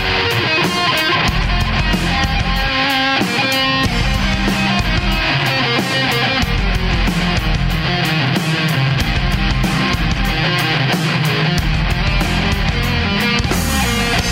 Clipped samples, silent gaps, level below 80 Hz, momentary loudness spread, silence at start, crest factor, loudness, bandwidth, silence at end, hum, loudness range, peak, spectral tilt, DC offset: under 0.1%; none; -22 dBFS; 3 LU; 0 s; 14 dB; -15 LUFS; 16.5 kHz; 0 s; none; 1 LU; 0 dBFS; -4.5 dB/octave; under 0.1%